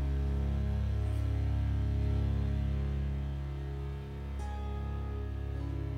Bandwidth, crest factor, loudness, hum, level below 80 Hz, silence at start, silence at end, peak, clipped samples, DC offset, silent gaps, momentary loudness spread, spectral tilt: 6.2 kHz; 10 dB; -35 LUFS; none; -34 dBFS; 0 s; 0 s; -22 dBFS; under 0.1%; under 0.1%; none; 7 LU; -8.5 dB/octave